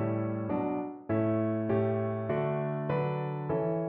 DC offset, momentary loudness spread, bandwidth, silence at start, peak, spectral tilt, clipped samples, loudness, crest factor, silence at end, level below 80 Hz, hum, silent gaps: under 0.1%; 4 LU; 4.3 kHz; 0 s; -16 dBFS; -9 dB/octave; under 0.1%; -31 LUFS; 14 dB; 0 s; -64 dBFS; none; none